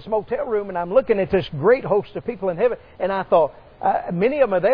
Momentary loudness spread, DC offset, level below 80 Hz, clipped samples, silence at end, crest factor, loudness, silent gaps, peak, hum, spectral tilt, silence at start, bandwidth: 7 LU; under 0.1%; -48 dBFS; under 0.1%; 0 s; 16 dB; -21 LUFS; none; -4 dBFS; none; -9.5 dB/octave; 0 s; 5.2 kHz